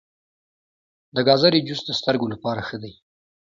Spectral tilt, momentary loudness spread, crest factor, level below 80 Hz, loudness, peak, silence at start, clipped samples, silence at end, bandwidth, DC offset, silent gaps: -5.5 dB/octave; 16 LU; 22 dB; -60 dBFS; -21 LUFS; -2 dBFS; 1.15 s; under 0.1%; 0.5 s; 7.6 kHz; under 0.1%; none